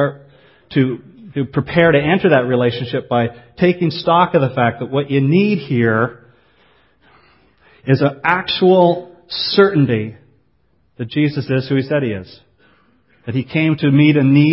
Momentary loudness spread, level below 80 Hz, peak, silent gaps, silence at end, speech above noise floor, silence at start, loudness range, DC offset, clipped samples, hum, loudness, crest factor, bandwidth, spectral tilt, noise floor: 11 LU; -50 dBFS; 0 dBFS; none; 0 s; 46 dB; 0 s; 4 LU; under 0.1%; under 0.1%; none; -16 LUFS; 16 dB; 5.8 kHz; -10.5 dB/octave; -61 dBFS